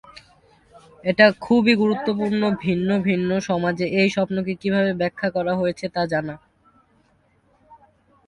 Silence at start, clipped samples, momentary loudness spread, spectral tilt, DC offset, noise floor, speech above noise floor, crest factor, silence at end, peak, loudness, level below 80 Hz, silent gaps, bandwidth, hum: 0.15 s; under 0.1%; 9 LU; -6.5 dB/octave; under 0.1%; -61 dBFS; 41 dB; 22 dB; 0.55 s; 0 dBFS; -21 LUFS; -56 dBFS; none; 10.5 kHz; none